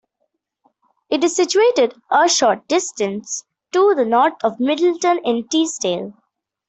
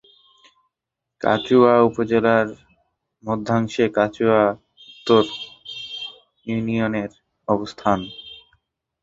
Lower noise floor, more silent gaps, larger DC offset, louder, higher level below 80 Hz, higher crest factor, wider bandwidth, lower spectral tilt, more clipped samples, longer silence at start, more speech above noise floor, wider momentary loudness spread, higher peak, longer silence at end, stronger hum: second, -72 dBFS vs -84 dBFS; neither; neither; about the same, -18 LUFS vs -20 LUFS; second, -66 dBFS vs -56 dBFS; second, 14 dB vs 20 dB; about the same, 8.4 kHz vs 7.8 kHz; second, -2.5 dB/octave vs -6.5 dB/octave; neither; second, 1.1 s vs 1.25 s; second, 55 dB vs 65 dB; second, 9 LU vs 18 LU; about the same, -4 dBFS vs -2 dBFS; about the same, 0.55 s vs 0.65 s; neither